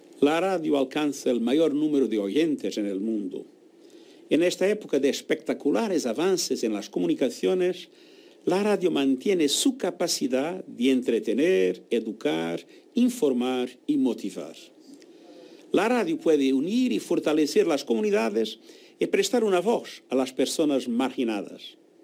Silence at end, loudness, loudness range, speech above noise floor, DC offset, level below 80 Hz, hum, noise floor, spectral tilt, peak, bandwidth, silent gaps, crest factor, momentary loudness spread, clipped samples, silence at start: 0.3 s; -25 LUFS; 3 LU; 27 dB; under 0.1%; -76 dBFS; none; -52 dBFS; -4 dB/octave; -8 dBFS; 16.5 kHz; none; 16 dB; 8 LU; under 0.1%; 0.15 s